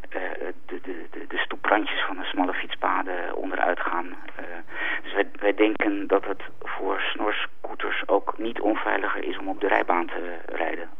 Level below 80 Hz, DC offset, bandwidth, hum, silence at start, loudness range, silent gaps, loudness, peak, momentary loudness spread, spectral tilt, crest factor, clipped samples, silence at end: -68 dBFS; 3%; 5.8 kHz; none; 0.05 s; 2 LU; none; -26 LUFS; -4 dBFS; 12 LU; -6 dB/octave; 22 dB; under 0.1%; 0.1 s